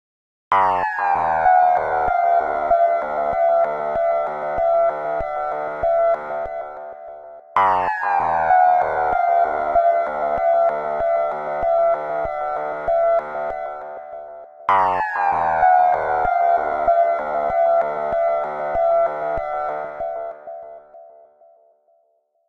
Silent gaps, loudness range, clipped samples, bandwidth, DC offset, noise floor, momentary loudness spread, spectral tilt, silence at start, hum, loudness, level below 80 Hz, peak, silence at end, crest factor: none; 4 LU; under 0.1%; 5.2 kHz; under 0.1%; -65 dBFS; 13 LU; -6 dB/octave; 0.5 s; none; -19 LUFS; -48 dBFS; -4 dBFS; 1.4 s; 16 dB